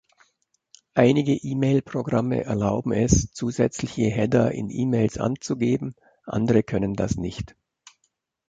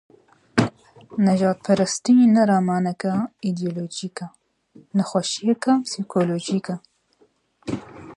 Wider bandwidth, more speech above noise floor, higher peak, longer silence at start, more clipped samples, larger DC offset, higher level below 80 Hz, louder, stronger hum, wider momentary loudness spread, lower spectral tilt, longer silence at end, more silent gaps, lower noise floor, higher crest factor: second, 9.2 kHz vs 11 kHz; first, 51 dB vs 41 dB; about the same, -4 dBFS vs -2 dBFS; first, 0.95 s vs 0.55 s; neither; neither; first, -42 dBFS vs -60 dBFS; about the same, -23 LUFS vs -22 LUFS; neither; second, 8 LU vs 16 LU; about the same, -6.5 dB/octave vs -5.5 dB/octave; first, 1.05 s vs 0.05 s; neither; first, -73 dBFS vs -61 dBFS; about the same, 20 dB vs 20 dB